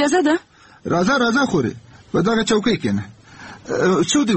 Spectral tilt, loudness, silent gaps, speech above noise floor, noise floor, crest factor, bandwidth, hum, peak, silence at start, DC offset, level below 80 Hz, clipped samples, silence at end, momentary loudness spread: -4.5 dB/octave; -19 LUFS; none; 22 dB; -40 dBFS; 12 dB; 8.8 kHz; none; -6 dBFS; 0 s; under 0.1%; -50 dBFS; under 0.1%; 0 s; 13 LU